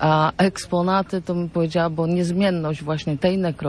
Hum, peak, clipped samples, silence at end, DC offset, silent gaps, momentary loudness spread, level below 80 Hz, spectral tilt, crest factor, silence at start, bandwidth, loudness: none; -6 dBFS; under 0.1%; 0 s; under 0.1%; none; 6 LU; -48 dBFS; -6.5 dB/octave; 16 dB; 0 s; 11 kHz; -21 LUFS